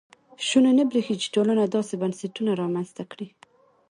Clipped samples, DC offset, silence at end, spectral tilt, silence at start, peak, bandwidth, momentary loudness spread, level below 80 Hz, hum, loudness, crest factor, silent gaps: under 0.1%; under 0.1%; 0.65 s; -5 dB/octave; 0.4 s; -8 dBFS; 11 kHz; 17 LU; -72 dBFS; none; -24 LUFS; 16 dB; none